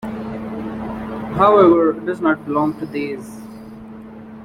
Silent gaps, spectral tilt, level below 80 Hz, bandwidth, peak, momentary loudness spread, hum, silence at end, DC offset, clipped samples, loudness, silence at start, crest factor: none; -8 dB/octave; -48 dBFS; 12 kHz; -2 dBFS; 25 LU; none; 0 s; under 0.1%; under 0.1%; -18 LUFS; 0 s; 18 dB